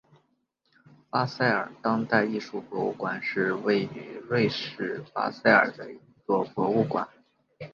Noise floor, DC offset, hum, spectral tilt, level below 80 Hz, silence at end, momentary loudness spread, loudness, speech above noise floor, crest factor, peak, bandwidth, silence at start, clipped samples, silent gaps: -73 dBFS; under 0.1%; none; -7 dB/octave; -70 dBFS; 0.05 s; 13 LU; -27 LUFS; 46 dB; 24 dB; -4 dBFS; 7.2 kHz; 1.15 s; under 0.1%; none